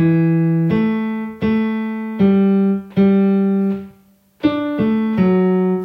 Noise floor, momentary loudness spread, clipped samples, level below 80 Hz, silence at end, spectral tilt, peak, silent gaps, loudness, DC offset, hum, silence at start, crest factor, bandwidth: -51 dBFS; 8 LU; under 0.1%; -54 dBFS; 0 s; -10.5 dB/octave; -4 dBFS; none; -17 LUFS; under 0.1%; none; 0 s; 12 dB; 5.4 kHz